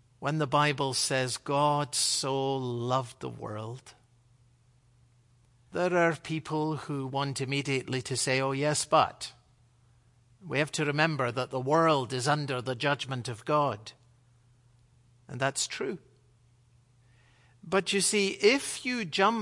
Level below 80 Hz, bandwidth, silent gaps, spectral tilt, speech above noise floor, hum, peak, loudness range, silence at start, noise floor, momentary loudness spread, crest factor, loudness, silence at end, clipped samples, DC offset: -70 dBFS; 11.5 kHz; none; -4 dB/octave; 35 dB; none; -8 dBFS; 8 LU; 0.2 s; -64 dBFS; 13 LU; 22 dB; -29 LUFS; 0 s; under 0.1%; under 0.1%